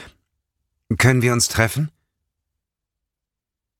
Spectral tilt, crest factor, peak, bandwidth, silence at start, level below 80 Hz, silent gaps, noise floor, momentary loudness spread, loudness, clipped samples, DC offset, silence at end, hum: -4.5 dB/octave; 20 dB; -2 dBFS; 16.5 kHz; 0 s; -46 dBFS; none; -85 dBFS; 12 LU; -18 LUFS; under 0.1%; under 0.1%; 1.9 s; none